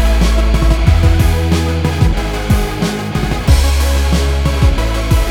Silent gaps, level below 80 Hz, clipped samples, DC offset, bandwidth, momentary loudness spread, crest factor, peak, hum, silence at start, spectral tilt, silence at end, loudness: none; -14 dBFS; under 0.1%; under 0.1%; 17 kHz; 6 LU; 12 dB; 0 dBFS; none; 0 s; -5.5 dB/octave; 0 s; -14 LUFS